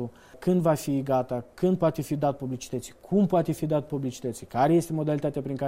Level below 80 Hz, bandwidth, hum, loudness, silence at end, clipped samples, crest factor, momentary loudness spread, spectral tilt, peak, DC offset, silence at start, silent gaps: -56 dBFS; 16 kHz; none; -27 LUFS; 0 s; under 0.1%; 16 dB; 11 LU; -7.5 dB/octave; -10 dBFS; under 0.1%; 0 s; none